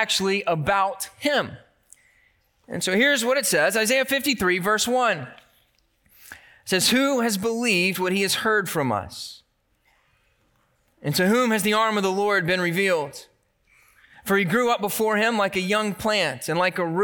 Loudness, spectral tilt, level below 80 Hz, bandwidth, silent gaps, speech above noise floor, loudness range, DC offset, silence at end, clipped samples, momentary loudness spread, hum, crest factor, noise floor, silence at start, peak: -22 LUFS; -3.5 dB/octave; -60 dBFS; 19 kHz; none; 44 dB; 4 LU; under 0.1%; 0 s; under 0.1%; 9 LU; none; 18 dB; -67 dBFS; 0 s; -6 dBFS